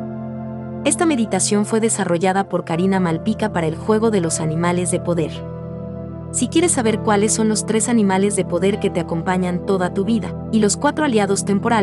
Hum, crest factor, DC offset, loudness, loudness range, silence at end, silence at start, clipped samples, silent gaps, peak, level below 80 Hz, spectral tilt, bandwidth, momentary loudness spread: none; 16 dB; under 0.1%; -18 LUFS; 2 LU; 0 s; 0 s; under 0.1%; none; -4 dBFS; -50 dBFS; -5 dB/octave; 12 kHz; 11 LU